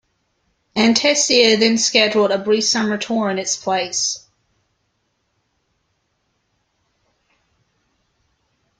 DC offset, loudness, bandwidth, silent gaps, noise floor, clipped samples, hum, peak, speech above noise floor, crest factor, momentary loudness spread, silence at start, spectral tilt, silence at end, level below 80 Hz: under 0.1%; -16 LUFS; 10 kHz; none; -69 dBFS; under 0.1%; none; 0 dBFS; 52 dB; 20 dB; 8 LU; 0.75 s; -2 dB/octave; 4.6 s; -62 dBFS